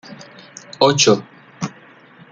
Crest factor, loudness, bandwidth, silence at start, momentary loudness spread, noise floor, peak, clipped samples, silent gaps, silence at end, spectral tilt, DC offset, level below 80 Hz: 20 dB; -15 LUFS; 10 kHz; 0.1 s; 25 LU; -45 dBFS; -2 dBFS; under 0.1%; none; 0.6 s; -3.5 dB/octave; under 0.1%; -60 dBFS